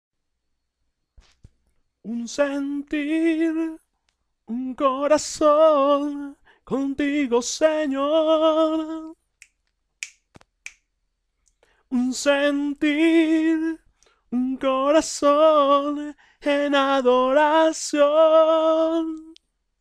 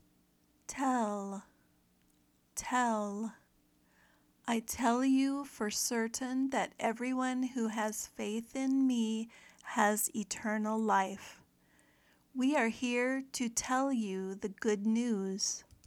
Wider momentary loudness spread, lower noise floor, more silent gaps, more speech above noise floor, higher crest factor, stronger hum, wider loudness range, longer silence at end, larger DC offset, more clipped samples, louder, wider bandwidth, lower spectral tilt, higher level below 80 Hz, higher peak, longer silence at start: first, 16 LU vs 11 LU; first, -75 dBFS vs -71 dBFS; neither; first, 55 dB vs 37 dB; second, 14 dB vs 22 dB; neither; first, 8 LU vs 4 LU; first, 0.5 s vs 0.25 s; neither; neither; first, -20 LUFS vs -34 LUFS; second, 12 kHz vs 17.5 kHz; about the same, -3 dB/octave vs -3.5 dB/octave; first, -60 dBFS vs -70 dBFS; first, -8 dBFS vs -14 dBFS; first, 2.05 s vs 0.7 s